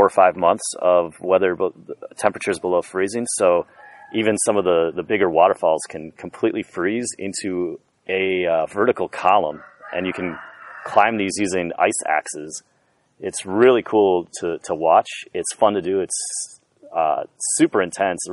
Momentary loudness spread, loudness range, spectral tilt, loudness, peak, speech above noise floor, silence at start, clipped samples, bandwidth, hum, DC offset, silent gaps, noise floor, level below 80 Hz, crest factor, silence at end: 13 LU; 3 LU; -3.5 dB/octave; -20 LUFS; 0 dBFS; 39 dB; 0 s; under 0.1%; 11.5 kHz; none; under 0.1%; none; -59 dBFS; -62 dBFS; 20 dB; 0 s